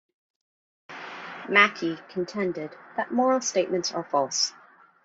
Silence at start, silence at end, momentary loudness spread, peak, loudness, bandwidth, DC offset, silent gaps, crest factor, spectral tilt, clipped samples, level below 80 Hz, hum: 0.9 s; 0.55 s; 19 LU; -4 dBFS; -25 LUFS; 8 kHz; under 0.1%; none; 24 dB; -2.5 dB/octave; under 0.1%; -74 dBFS; none